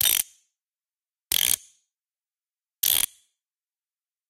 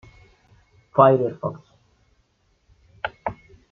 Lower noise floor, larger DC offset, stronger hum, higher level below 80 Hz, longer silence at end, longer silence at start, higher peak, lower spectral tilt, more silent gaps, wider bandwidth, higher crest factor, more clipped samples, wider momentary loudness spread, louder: first, under -90 dBFS vs -65 dBFS; neither; neither; about the same, -62 dBFS vs -58 dBFS; first, 1.25 s vs 0.4 s; second, 0 s vs 0.95 s; about the same, -4 dBFS vs -2 dBFS; second, 2.5 dB/octave vs -9 dB/octave; neither; first, 17 kHz vs 6.2 kHz; about the same, 26 dB vs 22 dB; neither; second, 7 LU vs 17 LU; about the same, -23 LUFS vs -22 LUFS